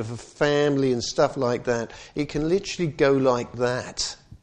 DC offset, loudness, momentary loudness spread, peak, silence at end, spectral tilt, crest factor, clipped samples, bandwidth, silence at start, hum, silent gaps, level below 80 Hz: under 0.1%; -24 LUFS; 8 LU; -6 dBFS; 0.05 s; -5 dB/octave; 18 dB; under 0.1%; 9.8 kHz; 0 s; none; none; -50 dBFS